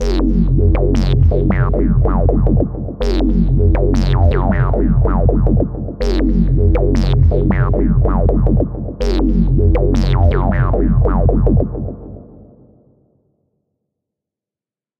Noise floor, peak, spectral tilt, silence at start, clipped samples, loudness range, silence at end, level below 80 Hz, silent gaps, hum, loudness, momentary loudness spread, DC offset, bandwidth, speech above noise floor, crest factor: under -90 dBFS; 0 dBFS; -9 dB/octave; 0 s; under 0.1%; 4 LU; 2.75 s; -16 dBFS; none; none; -15 LUFS; 6 LU; under 0.1%; 6.4 kHz; over 77 dB; 12 dB